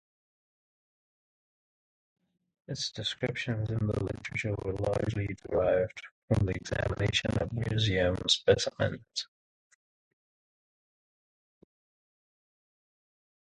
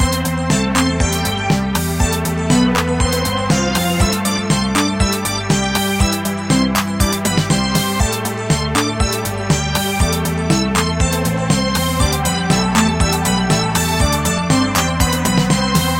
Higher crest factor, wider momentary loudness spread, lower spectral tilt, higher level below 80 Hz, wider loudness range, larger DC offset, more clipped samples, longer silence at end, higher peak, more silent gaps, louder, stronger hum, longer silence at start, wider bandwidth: first, 24 dB vs 16 dB; first, 9 LU vs 3 LU; about the same, -5 dB/octave vs -4.5 dB/octave; second, -50 dBFS vs -26 dBFS; first, 10 LU vs 2 LU; neither; neither; first, 4.25 s vs 0 s; second, -8 dBFS vs 0 dBFS; first, 6.12-6.28 s vs none; second, -31 LUFS vs -16 LUFS; neither; first, 2.7 s vs 0 s; second, 11 kHz vs 17 kHz